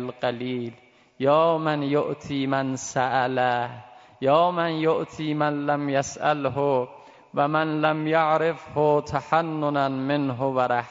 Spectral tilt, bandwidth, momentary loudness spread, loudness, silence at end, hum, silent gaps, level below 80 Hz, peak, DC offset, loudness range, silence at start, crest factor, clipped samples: -5.5 dB/octave; 7.8 kHz; 8 LU; -24 LUFS; 0 s; none; none; -64 dBFS; -6 dBFS; under 0.1%; 1 LU; 0 s; 18 dB; under 0.1%